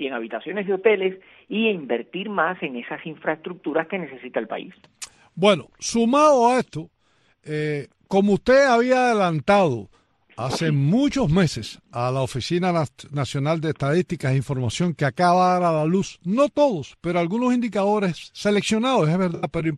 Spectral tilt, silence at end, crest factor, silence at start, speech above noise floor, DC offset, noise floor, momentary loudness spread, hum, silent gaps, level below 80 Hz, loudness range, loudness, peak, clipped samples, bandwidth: -6 dB/octave; 0 s; 18 dB; 0 s; 42 dB; under 0.1%; -63 dBFS; 12 LU; none; none; -52 dBFS; 6 LU; -22 LUFS; -4 dBFS; under 0.1%; 12.5 kHz